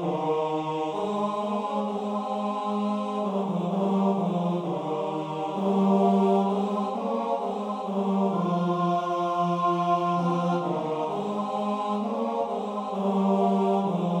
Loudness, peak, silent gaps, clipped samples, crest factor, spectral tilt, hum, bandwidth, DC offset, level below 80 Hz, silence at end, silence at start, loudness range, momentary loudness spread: -26 LUFS; -10 dBFS; none; under 0.1%; 16 dB; -8 dB/octave; none; 9 kHz; under 0.1%; -74 dBFS; 0 s; 0 s; 3 LU; 6 LU